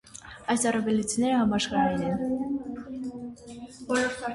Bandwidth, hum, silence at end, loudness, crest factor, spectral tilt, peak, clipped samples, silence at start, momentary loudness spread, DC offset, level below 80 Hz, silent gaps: 11.5 kHz; none; 0 s; -27 LUFS; 16 dB; -4 dB/octave; -10 dBFS; under 0.1%; 0.05 s; 17 LU; under 0.1%; -56 dBFS; none